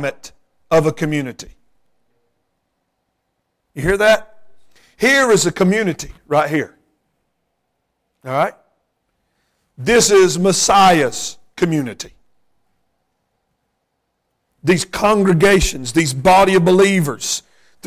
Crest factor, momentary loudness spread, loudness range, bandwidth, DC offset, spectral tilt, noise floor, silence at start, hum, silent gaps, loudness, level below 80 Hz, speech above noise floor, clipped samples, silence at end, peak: 14 dB; 15 LU; 12 LU; 16 kHz; under 0.1%; -4 dB/octave; -71 dBFS; 0 s; none; none; -15 LUFS; -40 dBFS; 57 dB; under 0.1%; 0.45 s; -4 dBFS